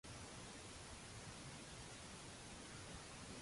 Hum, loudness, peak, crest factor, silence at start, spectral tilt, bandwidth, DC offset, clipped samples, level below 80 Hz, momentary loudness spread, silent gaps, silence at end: none; -54 LUFS; -40 dBFS; 14 dB; 0.05 s; -3 dB/octave; 11.5 kHz; under 0.1%; under 0.1%; -66 dBFS; 1 LU; none; 0 s